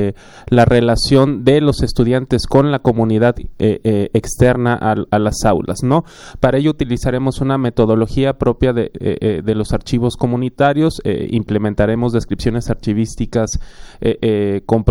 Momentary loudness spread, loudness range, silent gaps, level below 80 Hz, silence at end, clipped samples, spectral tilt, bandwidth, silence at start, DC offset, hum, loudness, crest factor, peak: 6 LU; 4 LU; none; -30 dBFS; 0 s; under 0.1%; -6.5 dB/octave; 16.5 kHz; 0 s; under 0.1%; none; -16 LUFS; 14 dB; 0 dBFS